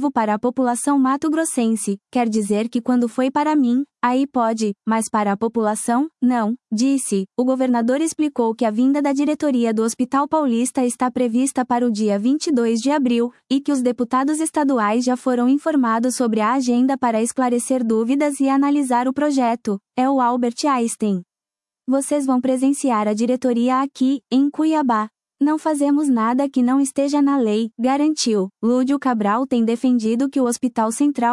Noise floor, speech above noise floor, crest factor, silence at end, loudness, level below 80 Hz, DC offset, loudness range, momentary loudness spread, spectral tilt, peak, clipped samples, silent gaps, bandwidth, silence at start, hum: under -90 dBFS; over 72 dB; 14 dB; 0 s; -19 LUFS; -68 dBFS; under 0.1%; 2 LU; 3 LU; -4.5 dB/octave; -6 dBFS; under 0.1%; none; 12 kHz; 0 s; none